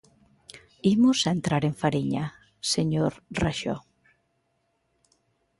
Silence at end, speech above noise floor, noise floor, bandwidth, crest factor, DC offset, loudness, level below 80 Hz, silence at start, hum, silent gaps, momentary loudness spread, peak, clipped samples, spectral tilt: 1.8 s; 49 dB; -73 dBFS; 11.5 kHz; 18 dB; under 0.1%; -26 LUFS; -52 dBFS; 0.55 s; none; none; 11 LU; -10 dBFS; under 0.1%; -5 dB/octave